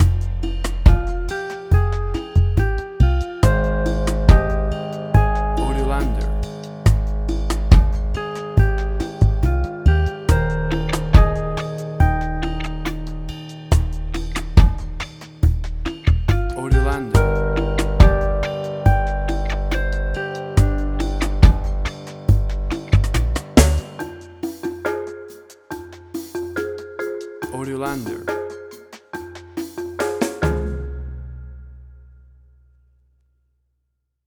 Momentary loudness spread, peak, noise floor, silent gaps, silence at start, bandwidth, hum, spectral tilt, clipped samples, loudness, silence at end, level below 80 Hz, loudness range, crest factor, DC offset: 16 LU; 0 dBFS; -73 dBFS; none; 0 s; 14.5 kHz; none; -6.5 dB/octave; under 0.1%; -20 LUFS; 2.35 s; -20 dBFS; 9 LU; 18 dB; under 0.1%